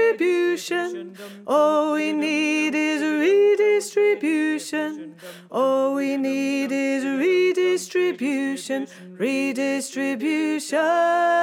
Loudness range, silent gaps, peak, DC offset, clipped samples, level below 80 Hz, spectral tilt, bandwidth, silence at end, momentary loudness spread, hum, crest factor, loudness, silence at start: 3 LU; none; -6 dBFS; under 0.1%; under 0.1%; under -90 dBFS; -3.5 dB/octave; 16.5 kHz; 0 s; 10 LU; none; 14 dB; -22 LUFS; 0 s